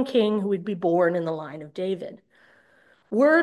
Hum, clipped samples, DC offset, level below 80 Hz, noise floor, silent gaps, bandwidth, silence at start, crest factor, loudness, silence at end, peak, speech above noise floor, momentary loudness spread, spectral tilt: none; under 0.1%; under 0.1%; -76 dBFS; -60 dBFS; none; 12 kHz; 0 s; 14 dB; -25 LUFS; 0 s; -10 dBFS; 37 dB; 12 LU; -7 dB/octave